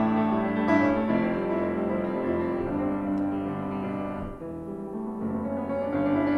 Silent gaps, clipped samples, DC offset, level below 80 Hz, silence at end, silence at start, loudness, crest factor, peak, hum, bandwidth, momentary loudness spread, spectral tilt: none; under 0.1%; under 0.1%; -52 dBFS; 0 s; 0 s; -28 LUFS; 18 dB; -10 dBFS; none; 6.4 kHz; 11 LU; -9 dB/octave